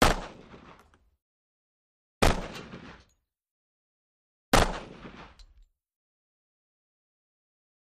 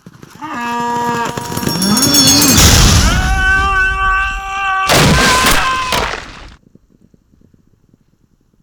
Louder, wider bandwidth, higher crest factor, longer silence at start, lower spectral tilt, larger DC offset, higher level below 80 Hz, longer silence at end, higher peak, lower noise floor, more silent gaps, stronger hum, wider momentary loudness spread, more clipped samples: second, -28 LUFS vs -11 LUFS; second, 14.5 kHz vs over 20 kHz; first, 26 dB vs 14 dB; about the same, 0 s vs 0.05 s; first, -4 dB/octave vs -2.5 dB/octave; neither; second, -38 dBFS vs -22 dBFS; first, 2.7 s vs 2.1 s; second, -6 dBFS vs 0 dBFS; first, -70 dBFS vs -55 dBFS; first, 1.22-2.21 s, 3.51-4.52 s vs none; neither; first, 25 LU vs 14 LU; neither